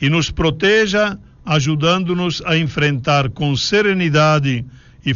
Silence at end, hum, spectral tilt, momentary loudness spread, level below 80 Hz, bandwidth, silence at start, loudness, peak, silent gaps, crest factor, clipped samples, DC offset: 0 s; none; -4 dB/octave; 7 LU; -40 dBFS; 7.4 kHz; 0 s; -16 LUFS; -2 dBFS; none; 14 dB; under 0.1%; under 0.1%